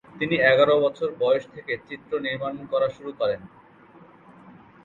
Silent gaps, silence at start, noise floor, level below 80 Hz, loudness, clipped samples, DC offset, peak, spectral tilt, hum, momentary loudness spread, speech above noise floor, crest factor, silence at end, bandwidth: none; 0.15 s; -51 dBFS; -62 dBFS; -24 LUFS; under 0.1%; under 0.1%; -4 dBFS; -6.5 dB/octave; none; 14 LU; 27 dB; 20 dB; 0.35 s; 7.2 kHz